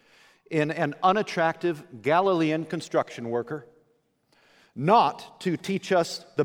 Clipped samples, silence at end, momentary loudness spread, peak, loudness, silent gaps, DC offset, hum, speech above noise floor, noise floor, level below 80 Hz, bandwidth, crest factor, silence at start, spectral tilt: under 0.1%; 0 s; 10 LU; -6 dBFS; -26 LUFS; none; under 0.1%; none; 43 dB; -68 dBFS; -74 dBFS; over 20 kHz; 20 dB; 0.5 s; -5.5 dB/octave